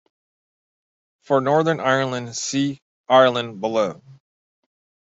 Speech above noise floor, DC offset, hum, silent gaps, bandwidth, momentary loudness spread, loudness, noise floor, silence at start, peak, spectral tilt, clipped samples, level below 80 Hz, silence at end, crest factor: over 70 dB; under 0.1%; none; 2.82-3.04 s; 8.2 kHz; 11 LU; -20 LUFS; under -90 dBFS; 1.3 s; -2 dBFS; -4.5 dB/octave; under 0.1%; -68 dBFS; 0.9 s; 20 dB